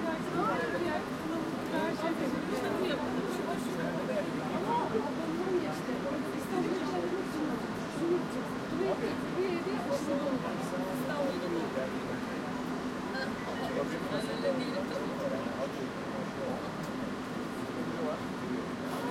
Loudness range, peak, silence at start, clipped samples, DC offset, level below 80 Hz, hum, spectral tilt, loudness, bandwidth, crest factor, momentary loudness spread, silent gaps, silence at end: 3 LU; -18 dBFS; 0 s; under 0.1%; under 0.1%; -62 dBFS; none; -5.5 dB/octave; -34 LUFS; 16.5 kHz; 16 dB; 4 LU; none; 0 s